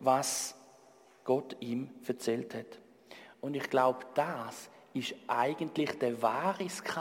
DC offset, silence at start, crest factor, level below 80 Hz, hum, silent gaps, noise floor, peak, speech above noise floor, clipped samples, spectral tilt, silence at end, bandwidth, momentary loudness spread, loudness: under 0.1%; 0 s; 20 dB; -82 dBFS; none; none; -61 dBFS; -14 dBFS; 28 dB; under 0.1%; -4 dB/octave; 0 s; 16.5 kHz; 15 LU; -34 LUFS